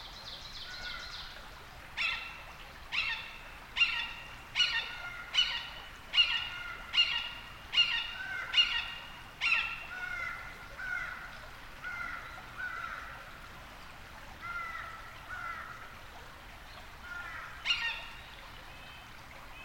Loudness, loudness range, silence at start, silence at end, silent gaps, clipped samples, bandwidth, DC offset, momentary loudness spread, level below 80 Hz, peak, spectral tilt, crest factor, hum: -33 LUFS; 13 LU; 0 s; 0 s; none; under 0.1%; 17 kHz; under 0.1%; 21 LU; -56 dBFS; -14 dBFS; -0.5 dB/octave; 22 dB; none